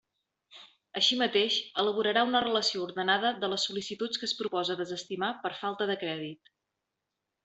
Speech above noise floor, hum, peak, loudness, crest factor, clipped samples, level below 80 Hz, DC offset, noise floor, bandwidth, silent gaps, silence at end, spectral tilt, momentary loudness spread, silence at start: 56 dB; none; -12 dBFS; -29 LUFS; 20 dB; under 0.1%; -76 dBFS; under 0.1%; -86 dBFS; 8.2 kHz; none; 1.1 s; -3 dB/octave; 9 LU; 0.5 s